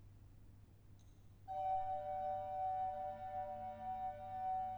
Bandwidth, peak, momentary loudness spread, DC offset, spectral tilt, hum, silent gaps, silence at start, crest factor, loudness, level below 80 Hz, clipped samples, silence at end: over 20 kHz; -32 dBFS; 23 LU; under 0.1%; -7 dB/octave; none; none; 0 s; 12 dB; -44 LUFS; -66 dBFS; under 0.1%; 0 s